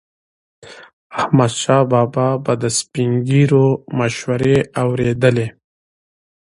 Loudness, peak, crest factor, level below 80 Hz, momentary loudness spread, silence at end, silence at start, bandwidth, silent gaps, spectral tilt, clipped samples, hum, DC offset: -16 LUFS; 0 dBFS; 18 dB; -50 dBFS; 6 LU; 0.95 s; 0.65 s; 11.5 kHz; 0.93-1.10 s; -6 dB/octave; under 0.1%; none; under 0.1%